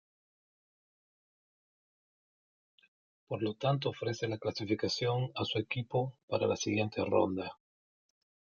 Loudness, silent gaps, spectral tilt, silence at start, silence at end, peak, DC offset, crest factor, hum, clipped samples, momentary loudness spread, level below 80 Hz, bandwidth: -34 LUFS; 6.23-6.28 s; -5.5 dB/octave; 3.3 s; 1.05 s; -16 dBFS; under 0.1%; 22 dB; none; under 0.1%; 6 LU; -74 dBFS; 7.2 kHz